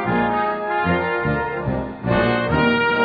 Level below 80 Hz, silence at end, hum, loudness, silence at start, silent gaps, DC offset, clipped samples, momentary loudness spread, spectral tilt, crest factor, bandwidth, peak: -38 dBFS; 0 s; none; -20 LUFS; 0 s; none; under 0.1%; under 0.1%; 7 LU; -9 dB/octave; 16 dB; 5 kHz; -4 dBFS